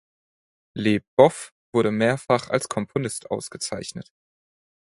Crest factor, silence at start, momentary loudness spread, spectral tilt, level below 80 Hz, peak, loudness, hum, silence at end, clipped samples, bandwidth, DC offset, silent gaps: 24 dB; 0.75 s; 16 LU; -5 dB/octave; -60 dBFS; 0 dBFS; -23 LUFS; none; 0.8 s; under 0.1%; 11.5 kHz; under 0.1%; 1.07-1.17 s, 1.52-1.73 s